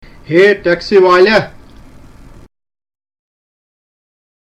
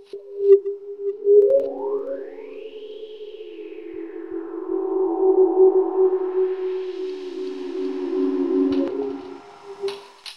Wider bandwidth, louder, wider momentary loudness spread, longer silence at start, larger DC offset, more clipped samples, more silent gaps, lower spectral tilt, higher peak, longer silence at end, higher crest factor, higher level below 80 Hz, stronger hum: first, 8.6 kHz vs 6 kHz; first, -10 LUFS vs -21 LUFS; second, 7 LU vs 20 LU; first, 0.3 s vs 0 s; second, under 0.1% vs 0.3%; neither; neither; about the same, -6 dB/octave vs -6 dB/octave; first, 0 dBFS vs -4 dBFS; first, 3.05 s vs 0 s; about the same, 14 dB vs 18 dB; first, -42 dBFS vs -68 dBFS; neither